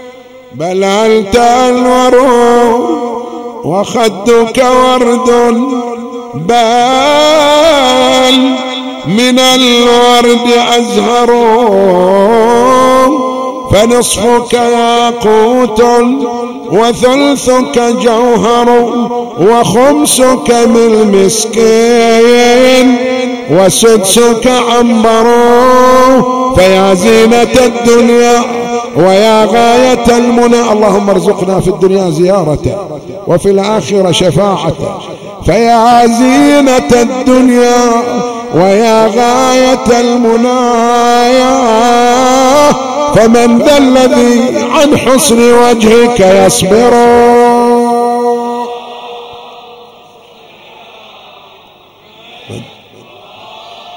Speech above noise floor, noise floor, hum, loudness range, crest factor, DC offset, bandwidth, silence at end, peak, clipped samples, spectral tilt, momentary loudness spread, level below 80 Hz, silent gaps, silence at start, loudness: 33 dB; -39 dBFS; none; 4 LU; 8 dB; 2%; 16.5 kHz; 0 s; 0 dBFS; 3%; -4 dB/octave; 9 LU; -34 dBFS; none; 0 s; -7 LUFS